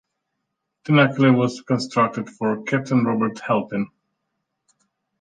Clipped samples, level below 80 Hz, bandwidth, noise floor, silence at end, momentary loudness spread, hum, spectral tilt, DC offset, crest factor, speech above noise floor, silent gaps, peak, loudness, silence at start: under 0.1%; -66 dBFS; 9.4 kHz; -78 dBFS; 1.35 s; 10 LU; none; -7 dB/octave; under 0.1%; 18 dB; 59 dB; none; -4 dBFS; -20 LUFS; 0.85 s